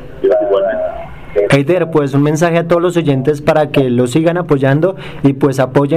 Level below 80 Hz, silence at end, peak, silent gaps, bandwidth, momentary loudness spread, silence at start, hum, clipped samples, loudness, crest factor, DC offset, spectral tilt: -42 dBFS; 0 s; -2 dBFS; none; 14 kHz; 5 LU; 0 s; none; under 0.1%; -13 LUFS; 10 dB; 0.8%; -7 dB/octave